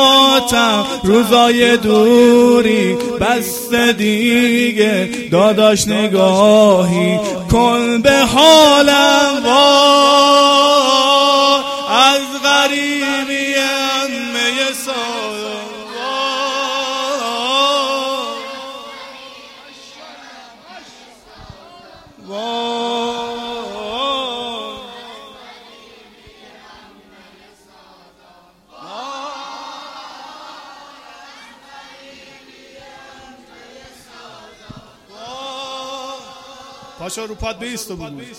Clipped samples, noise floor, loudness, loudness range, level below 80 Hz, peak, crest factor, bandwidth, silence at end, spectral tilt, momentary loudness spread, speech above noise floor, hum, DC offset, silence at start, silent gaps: under 0.1%; -48 dBFS; -12 LUFS; 23 LU; -44 dBFS; 0 dBFS; 16 dB; 16.5 kHz; 0 s; -3.5 dB/octave; 22 LU; 37 dB; none; under 0.1%; 0 s; none